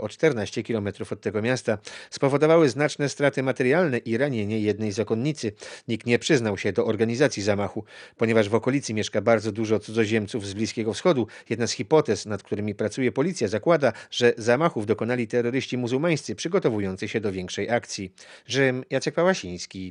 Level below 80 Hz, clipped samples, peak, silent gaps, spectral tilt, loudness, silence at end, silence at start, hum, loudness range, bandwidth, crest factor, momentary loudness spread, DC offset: -72 dBFS; under 0.1%; -6 dBFS; none; -5.5 dB/octave; -24 LUFS; 0 s; 0 s; none; 3 LU; 10.5 kHz; 18 dB; 9 LU; under 0.1%